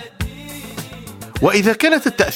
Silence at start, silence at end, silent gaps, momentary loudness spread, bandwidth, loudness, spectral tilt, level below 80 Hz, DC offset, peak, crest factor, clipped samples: 0 s; 0 s; none; 18 LU; 18 kHz; -15 LUFS; -4.5 dB/octave; -38 dBFS; under 0.1%; 0 dBFS; 18 dB; under 0.1%